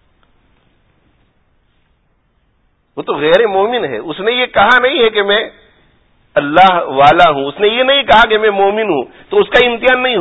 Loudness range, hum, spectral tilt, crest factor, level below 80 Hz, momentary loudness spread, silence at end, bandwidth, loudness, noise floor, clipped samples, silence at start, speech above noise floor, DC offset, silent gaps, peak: 7 LU; none; -5 dB/octave; 12 dB; -44 dBFS; 10 LU; 0 s; 8 kHz; -11 LUFS; -58 dBFS; 0.2%; 2.95 s; 47 dB; under 0.1%; none; 0 dBFS